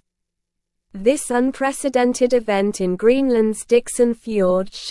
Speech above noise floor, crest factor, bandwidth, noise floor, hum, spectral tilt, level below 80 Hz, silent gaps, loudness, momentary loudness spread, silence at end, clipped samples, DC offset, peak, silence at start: 60 dB; 16 dB; 12 kHz; -78 dBFS; none; -5 dB/octave; -50 dBFS; none; -19 LUFS; 4 LU; 0 s; under 0.1%; under 0.1%; -4 dBFS; 0.95 s